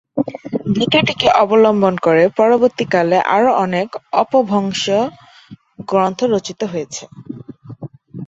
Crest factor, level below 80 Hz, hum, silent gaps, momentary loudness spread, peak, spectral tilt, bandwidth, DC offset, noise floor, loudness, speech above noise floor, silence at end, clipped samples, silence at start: 16 dB; -54 dBFS; none; none; 21 LU; 0 dBFS; -5 dB/octave; 8 kHz; under 0.1%; -42 dBFS; -15 LUFS; 27 dB; 0 s; under 0.1%; 0.15 s